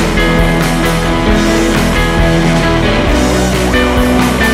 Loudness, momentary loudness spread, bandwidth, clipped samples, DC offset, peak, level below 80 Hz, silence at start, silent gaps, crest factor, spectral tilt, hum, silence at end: -11 LUFS; 1 LU; 16 kHz; under 0.1%; under 0.1%; -2 dBFS; -18 dBFS; 0 s; none; 8 dB; -5 dB/octave; none; 0 s